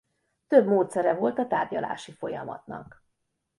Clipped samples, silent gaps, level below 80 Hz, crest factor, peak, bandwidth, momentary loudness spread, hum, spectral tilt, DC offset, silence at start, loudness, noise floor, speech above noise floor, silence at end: under 0.1%; none; -68 dBFS; 22 dB; -6 dBFS; 11.5 kHz; 17 LU; none; -6.5 dB/octave; under 0.1%; 0.5 s; -26 LUFS; -78 dBFS; 52 dB; 0.75 s